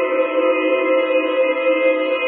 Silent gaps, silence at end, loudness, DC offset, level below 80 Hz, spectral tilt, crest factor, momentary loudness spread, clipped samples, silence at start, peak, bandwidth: none; 0 s; -17 LUFS; under 0.1%; under -90 dBFS; -6 dB/octave; 12 dB; 1 LU; under 0.1%; 0 s; -6 dBFS; 4 kHz